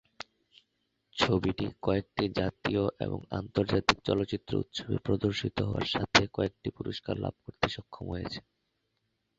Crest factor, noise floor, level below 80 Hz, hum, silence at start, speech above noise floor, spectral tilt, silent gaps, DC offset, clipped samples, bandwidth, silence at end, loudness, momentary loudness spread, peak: 26 dB; -79 dBFS; -52 dBFS; none; 1.15 s; 48 dB; -5.5 dB/octave; none; under 0.1%; under 0.1%; 8 kHz; 1 s; -31 LUFS; 12 LU; -6 dBFS